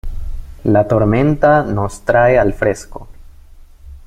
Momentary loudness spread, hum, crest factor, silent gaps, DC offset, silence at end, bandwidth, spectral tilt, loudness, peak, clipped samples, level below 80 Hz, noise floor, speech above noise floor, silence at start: 19 LU; none; 14 dB; none; under 0.1%; 0.1 s; 13 kHz; -7.5 dB/octave; -14 LUFS; -2 dBFS; under 0.1%; -28 dBFS; -39 dBFS; 26 dB; 0.05 s